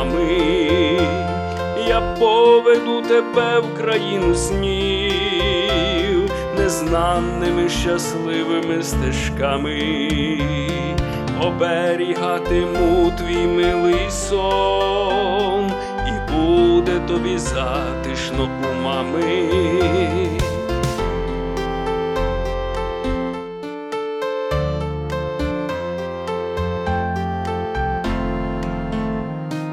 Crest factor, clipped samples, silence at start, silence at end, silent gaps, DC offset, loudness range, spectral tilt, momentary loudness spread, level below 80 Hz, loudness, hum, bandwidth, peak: 16 dB; under 0.1%; 0 s; 0 s; none; under 0.1%; 7 LU; -5.5 dB/octave; 8 LU; -30 dBFS; -19 LUFS; none; 13.5 kHz; -4 dBFS